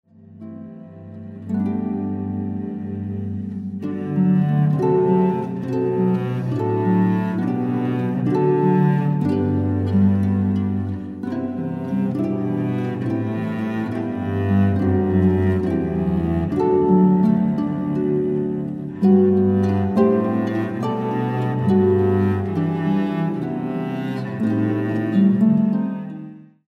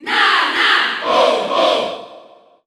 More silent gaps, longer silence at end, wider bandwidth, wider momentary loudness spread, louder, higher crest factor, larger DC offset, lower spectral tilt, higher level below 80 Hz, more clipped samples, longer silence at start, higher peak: neither; second, 0.25 s vs 0.45 s; second, 4.8 kHz vs 15 kHz; first, 11 LU vs 7 LU; second, -20 LUFS vs -14 LUFS; about the same, 16 dB vs 14 dB; neither; first, -10.5 dB/octave vs -1.5 dB/octave; first, -50 dBFS vs -62 dBFS; neither; first, 0.3 s vs 0 s; about the same, -4 dBFS vs -2 dBFS